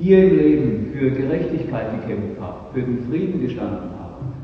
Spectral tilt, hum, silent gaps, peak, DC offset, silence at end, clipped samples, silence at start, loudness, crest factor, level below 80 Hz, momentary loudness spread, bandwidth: -10.5 dB/octave; none; none; -2 dBFS; under 0.1%; 0 s; under 0.1%; 0 s; -20 LUFS; 18 dB; -44 dBFS; 16 LU; 5.6 kHz